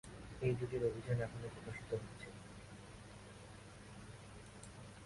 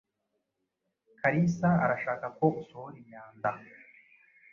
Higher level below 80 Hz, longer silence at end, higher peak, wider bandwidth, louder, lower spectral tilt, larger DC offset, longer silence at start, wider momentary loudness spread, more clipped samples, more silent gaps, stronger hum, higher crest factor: about the same, -62 dBFS vs -66 dBFS; second, 0 s vs 0.9 s; second, -26 dBFS vs -10 dBFS; first, 11.5 kHz vs 7 kHz; second, -45 LUFS vs -29 LUFS; second, -6.5 dB/octave vs -8.5 dB/octave; neither; second, 0.05 s vs 1.25 s; second, 16 LU vs 20 LU; neither; neither; neither; about the same, 18 dB vs 22 dB